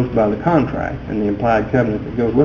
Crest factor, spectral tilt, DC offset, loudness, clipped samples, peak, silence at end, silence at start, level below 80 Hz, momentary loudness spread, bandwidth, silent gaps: 16 dB; -9 dB/octave; under 0.1%; -18 LUFS; under 0.1%; 0 dBFS; 0 s; 0 s; -36 dBFS; 6 LU; 7 kHz; none